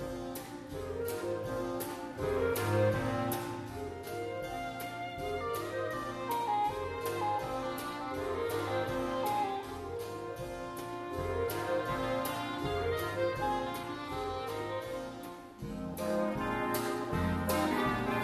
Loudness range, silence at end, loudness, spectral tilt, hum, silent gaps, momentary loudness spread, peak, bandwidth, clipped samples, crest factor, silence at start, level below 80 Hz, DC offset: 3 LU; 0 s; -35 LUFS; -5.5 dB/octave; none; none; 9 LU; -18 dBFS; 14 kHz; under 0.1%; 16 dB; 0 s; -54 dBFS; under 0.1%